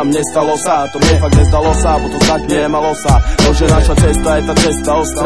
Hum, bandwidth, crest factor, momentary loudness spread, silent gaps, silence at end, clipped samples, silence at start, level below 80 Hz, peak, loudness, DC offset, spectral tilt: none; 11 kHz; 10 dB; 4 LU; none; 0 s; under 0.1%; 0 s; -16 dBFS; 0 dBFS; -12 LUFS; 2%; -5 dB/octave